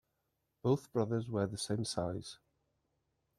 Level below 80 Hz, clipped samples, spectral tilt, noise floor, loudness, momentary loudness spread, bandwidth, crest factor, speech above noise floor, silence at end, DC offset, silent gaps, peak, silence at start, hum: -68 dBFS; under 0.1%; -6 dB/octave; -83 dBFS; -37 LUFS; 11 LU; 13.5 kHz; 20 dB; 48 dB; 1.05 s; under 0.1%; none; -20 dBFS; 0.65 s; none